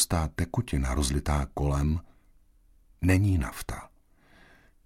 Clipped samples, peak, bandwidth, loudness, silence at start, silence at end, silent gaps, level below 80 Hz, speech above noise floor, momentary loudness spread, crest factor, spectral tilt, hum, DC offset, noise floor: under 0.1%; -10 dBFS; 16 kHz; -28 LUFS; 0 s; 1 s; none; -36 dBFS; 33 dB; 10 LU; 20 dB; -5 dB/octave; none; under 0.1%; -60 dBFS